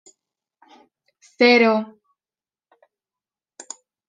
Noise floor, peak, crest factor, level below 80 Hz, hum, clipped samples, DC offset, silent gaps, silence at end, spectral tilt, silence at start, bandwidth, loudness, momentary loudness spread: under -90 dBFS; -2 dBFS; 22 dB; -80 dBFS; none; under 0.1%; under 0.1%; none; 2.25 s; -3.5 dB/octave; 1.4 s; 9.8 kHz; -16 LUFS; 24 LU